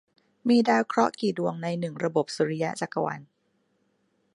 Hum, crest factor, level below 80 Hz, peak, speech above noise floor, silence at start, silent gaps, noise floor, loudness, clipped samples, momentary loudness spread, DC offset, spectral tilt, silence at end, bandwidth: none; 20 dB; -74 dBFS; -8 dBFS; 46 dB; 0.45 s; none; -72 dBFS; -26 LUFS; under 0.1%; 9 LU; under 0.1%; -6 dB/octave; 1.1 s; 11.5 kHz